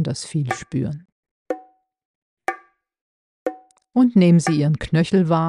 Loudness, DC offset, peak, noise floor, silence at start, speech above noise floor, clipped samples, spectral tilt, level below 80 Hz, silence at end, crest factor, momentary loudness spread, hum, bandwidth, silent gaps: -20 LUFS; under 0.1%; -4 dBFS; -49 dBFS; 0 s; 31 dB; under 0.1%; -7 dB/octave; -50 dBFS; 0 s; 16 dB; 17 LU; none; 11 kHz; 1.12-1.23 s, 1.31-1.46 s, 2.05-2.37 s, 3.01-3.46 s